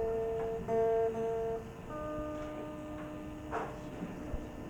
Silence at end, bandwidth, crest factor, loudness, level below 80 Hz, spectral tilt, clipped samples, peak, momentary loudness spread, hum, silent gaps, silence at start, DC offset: 0 s; 19 kHz; 14 dB; -37 LUFS; -52 dBFS; -7 dB/octave; under 0.1%; -22 dBFS; 12 LU; none; none; 0 s; under 0.1%